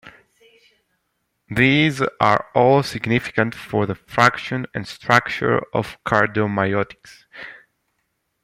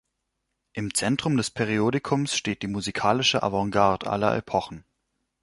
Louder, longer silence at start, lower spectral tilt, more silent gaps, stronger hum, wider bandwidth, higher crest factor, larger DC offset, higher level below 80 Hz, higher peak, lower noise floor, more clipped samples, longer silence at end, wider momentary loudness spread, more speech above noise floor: first, -19 LUFS vs -25 LUFS; second, 0.05 s vs 0.75 s; first, -6 dB/octave vs -4.5 dB/octave; neither; neither; first, 16 kHz vs 11.5 kHz; about the same, 20 dB vs 22 dB; neither; about the same, -54 dBFS vs -54 dBFS; first, 0 dBFS vs -4 dBFS; second, -73 dBFS vs -79 dBFS; neither; first, 0.9 s vs 0.6 s; first, 12 LU vs 7 LU; about the same, 53 dB vs 54 dB